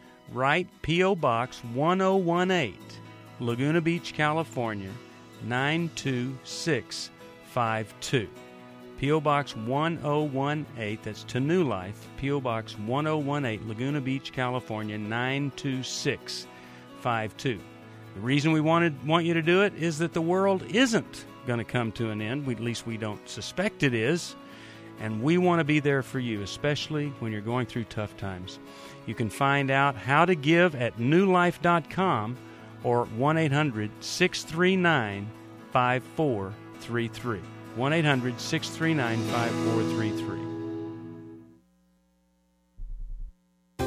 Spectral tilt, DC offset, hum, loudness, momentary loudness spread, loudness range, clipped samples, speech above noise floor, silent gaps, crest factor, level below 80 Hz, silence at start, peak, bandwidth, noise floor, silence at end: -5.5 dB/octave; under 0.1%; none; -27 LUFS; 17 LU; 6 LU; under 0.1%; 41 dB; none; 20 dB; -54 dBFS; 0.05 s; -8 dBFS; 15 kHz; -68 dBFS; 0 s